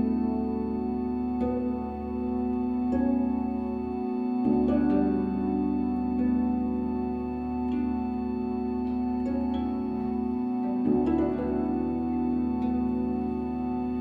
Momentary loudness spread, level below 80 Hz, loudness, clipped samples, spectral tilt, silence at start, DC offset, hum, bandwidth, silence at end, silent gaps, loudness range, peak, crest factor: 6 LU; -44 dBFS; -28 LUFS; under 0.1%; -10.5 dB/octave; 0 s; under 0.1%; none; 4.7 kHz; 0 s; none; 3 LU; -14 dBFS; 14 dB